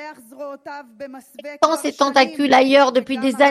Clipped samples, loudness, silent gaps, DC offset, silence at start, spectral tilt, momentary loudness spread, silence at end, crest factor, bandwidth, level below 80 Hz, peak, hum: under 0.1%; -16 LUFS; none; under 0.1%; 0 s; -3 dB/octave; 22 LU; 0 s; 18 dB; 14 kHz; -66 dBFS; 0 dBFS; none